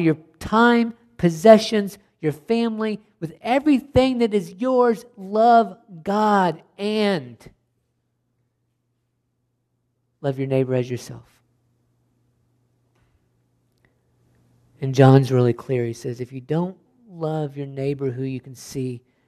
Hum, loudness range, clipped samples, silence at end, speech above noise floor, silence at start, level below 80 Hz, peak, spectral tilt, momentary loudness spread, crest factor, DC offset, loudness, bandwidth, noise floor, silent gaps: none; 10 LU; under 0.1%; 0.3 s; 53 dB; 0 s; -54 dBFS; 0 dBFS; -7 dB/octave; 16 LU; 22 dB; under 0.1%; -21 LUFS; 13.5 kHz; -72 dBFS; none